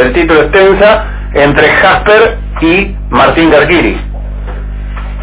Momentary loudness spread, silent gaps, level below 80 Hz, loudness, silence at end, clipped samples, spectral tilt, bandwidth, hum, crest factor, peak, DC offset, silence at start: 16 LU; none; -18 dBFS; -7 LUFS; 0 s; 3%; -9.5 dB/octave; 4 kHz; 50 Hz at -20 dBFS; 8 dB; 0 dBFS; under 0.1%; 0 s